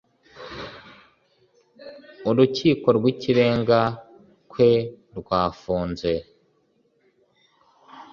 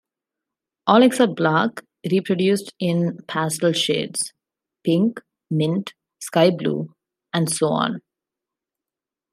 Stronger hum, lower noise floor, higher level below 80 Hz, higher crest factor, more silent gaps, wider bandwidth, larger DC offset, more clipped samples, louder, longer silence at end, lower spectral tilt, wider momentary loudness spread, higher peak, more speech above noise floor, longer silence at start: neither; second, -65 dBFS vs -88 dBFS; first, -52 dBFS vs -70 dBFS; about the same, 20 dB vs 20 dB; neither; second, 7.2 kHz vs 15 kHz; neither; neither; about the same, -22 LUFS vs -21 LUFS; second, 0.1 s vs 1.35 s; first, -7 dB/octave vs -5 dB/octave; first, 21 LU vs 12 LU; about the same, -4 dBFS vs -2 dBFS; second, 45 dB vs 69 dB; second, 0.35 s vs 0.85 s